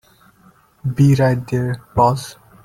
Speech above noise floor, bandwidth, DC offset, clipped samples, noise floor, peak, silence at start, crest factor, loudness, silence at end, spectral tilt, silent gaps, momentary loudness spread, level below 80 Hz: 36 dB; 14.5 kHz; under 0.1%; under 0.1%; -52 dBFS; -2 dBFS; 0.85 s; 16 dB; -17 LUFS; 0.3 s; -7.5 dB/octave; none; 13 LU; -46 dBFS